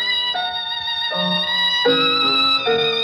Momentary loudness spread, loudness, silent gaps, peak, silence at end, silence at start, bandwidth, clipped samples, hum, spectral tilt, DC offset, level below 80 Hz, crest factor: 7 LU; -17 LUFS; none; -6 dBFS; 0 s; 0 s; 13.5 kHz; under 0.1%; none; -3.5 dB/octave; under 0.1%; -60 dBFS; 14 dB